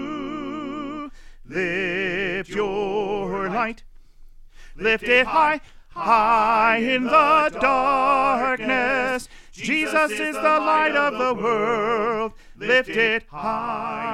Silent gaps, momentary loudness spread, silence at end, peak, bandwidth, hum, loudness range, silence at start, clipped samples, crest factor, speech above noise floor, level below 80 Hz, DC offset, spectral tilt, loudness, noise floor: none; 13 LU; 0 s; -4 dBFS; 15 kHz; none; 7 LU; 0 s; under 0.1%; 18 dB; 23 dB; -46 dBFS; under 0.1%; -4.5 dB/octave; -21 LUFS; -44 dBFS